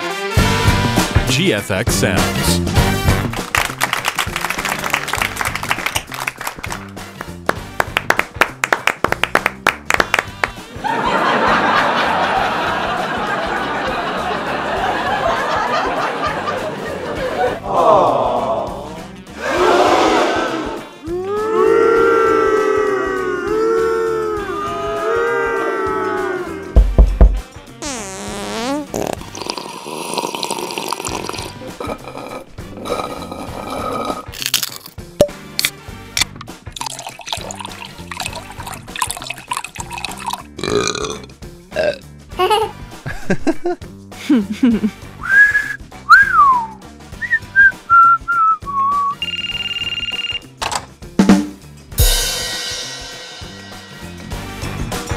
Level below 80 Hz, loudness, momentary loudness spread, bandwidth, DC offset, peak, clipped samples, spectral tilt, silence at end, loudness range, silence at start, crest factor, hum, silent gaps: -28 dBFS; -17 LUFS; 16 LU; 16 kHz; under 0.1%; 0 dBFS; under 0.1%; -4 dB/octave; 0 s; 10 LU; 0 s; 18 dB; none; none